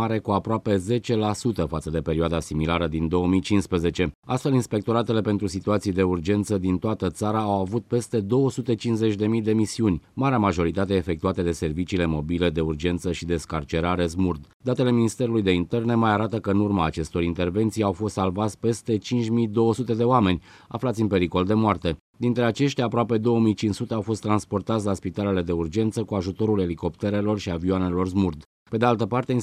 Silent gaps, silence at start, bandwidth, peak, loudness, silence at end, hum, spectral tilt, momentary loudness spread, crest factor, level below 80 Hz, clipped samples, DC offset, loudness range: 4.15-4.23 s, 14.54-14.60 s, 22.00-22.13 s, 28.46-28.66 s; 0 s; 13.5 kHz; -6 dBFS; -24 LUFS; 0 s; none; -7 dB/octave; 5 LU; 18 dB; -44 dBFS; under 0.1%; under 0.1%; 2 LU